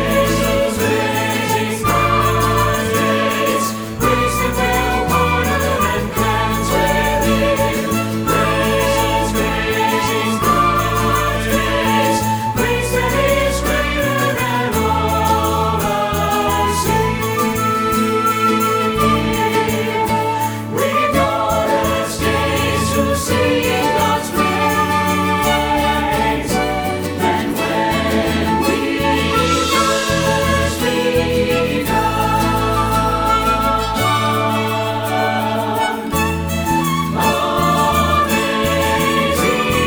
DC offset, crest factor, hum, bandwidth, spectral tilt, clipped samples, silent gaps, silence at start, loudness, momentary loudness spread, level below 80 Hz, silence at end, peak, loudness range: under 0.1%; 14 dB; none; over 20 kHz; -4.5 dB/octave; under 0.1%; none; 0 s; -16 LUFS; 3 LU; -30 dBFS; 0 s; -2 dBFS; 1 LU